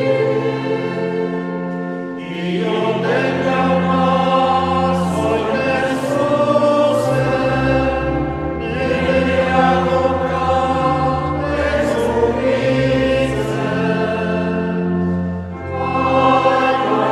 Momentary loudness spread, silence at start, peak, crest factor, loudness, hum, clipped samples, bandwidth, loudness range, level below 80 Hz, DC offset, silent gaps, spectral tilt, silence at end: 8 LU; 0 s; -2 dBFS; 14 dB; -17 LUFS; none; under 0.1%; 12.5 kHz; 3 LU; -36 dBFS; under 0.1%; none; -7 dB/octave; 0 s